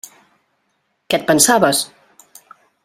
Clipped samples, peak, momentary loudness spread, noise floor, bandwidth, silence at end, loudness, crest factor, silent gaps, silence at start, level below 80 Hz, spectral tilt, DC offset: under 0.1%; 0 dBFS; 10 LU; -68 dBFS; 16 kHz; 1 s; -14 LUFS; 20 dB; none; 1.1 s; -60 dBFS; -2.5 dB/octave; under 0.1%